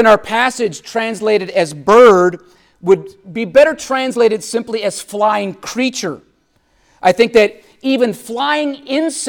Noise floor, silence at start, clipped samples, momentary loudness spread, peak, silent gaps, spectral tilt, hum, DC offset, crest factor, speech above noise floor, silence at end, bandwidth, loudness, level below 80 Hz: -58 dBFS; 0 s; under 0.1%; 11 LU; 0 dBFS; none; -4 dB/octave; none; under 0.1%; 14 dB; 44 dB; 0 s; 17.5 kHz; -14 LUFS; -52 dBFS